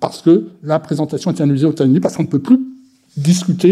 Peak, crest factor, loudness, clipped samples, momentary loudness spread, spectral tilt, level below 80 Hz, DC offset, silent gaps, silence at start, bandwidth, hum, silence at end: 0 dBFS; 14 dB; -15 LUFS; under 0.1%; 7 LU; -7 dB/octave; -62 dBFS; under 0.1%; none; 0 s; 13.5 kHz; none; 0 s